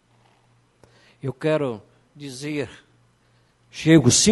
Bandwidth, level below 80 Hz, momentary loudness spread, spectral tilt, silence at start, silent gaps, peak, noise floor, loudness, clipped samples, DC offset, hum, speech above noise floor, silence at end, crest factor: 11.5 kHz; -54 dBFS; 24 LU; -4 dB/octave; 1.25 s; none; -2 dBFS; -61 dBFS; -21 LUFS; under 0.1%; under 0.1%; none; 41 dB; 0 s; 22 dB